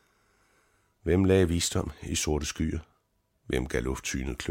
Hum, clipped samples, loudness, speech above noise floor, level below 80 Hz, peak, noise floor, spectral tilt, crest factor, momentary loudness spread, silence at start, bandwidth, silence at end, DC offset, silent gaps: none; under 0.1%; -29 LUFS; 45 dB; -42 dBFS; -10 dBFS; -73 dBFS; -5 dB/octave; 20 dB; 10 LU; 1.05 s; 16.5 kHz; 0 s; under 0.1%; none